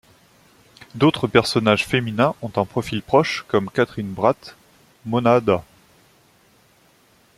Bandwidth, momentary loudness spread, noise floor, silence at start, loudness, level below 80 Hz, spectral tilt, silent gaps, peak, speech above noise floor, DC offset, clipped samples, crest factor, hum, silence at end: 15 kHz; 8 LU; -56 dBFS; 0.95 s; -20 LUFS; -54 dBFS; -6 dB/octave; none; 0 dBFS; 37 dB; under 0.1%; under 0.1%; 20 dB; none; 1.75 s